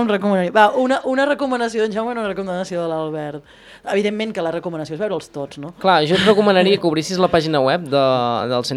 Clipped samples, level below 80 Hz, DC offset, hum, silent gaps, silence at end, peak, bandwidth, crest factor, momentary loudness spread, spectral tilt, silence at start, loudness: under 0.1%; -54 dBFS; under 0.1%; none; none; 0 s; 0 dBFS; 12.5 kHz; 18 dB; 12 LU; -5.5 dB/octave; 0 s; -18 LUFS